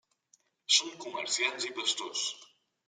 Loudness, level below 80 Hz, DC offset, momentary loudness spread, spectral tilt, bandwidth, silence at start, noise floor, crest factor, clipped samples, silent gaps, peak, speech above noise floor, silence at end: -30 LUFS; under -90 dBFS; under 0.1%; 13 LU; 1.5 dB/octave; 13 kHz; 0.7 s; -70 dBFS; 24 dB; under 0.1%; none; -12 dBFS; 38 dB; 0.4 s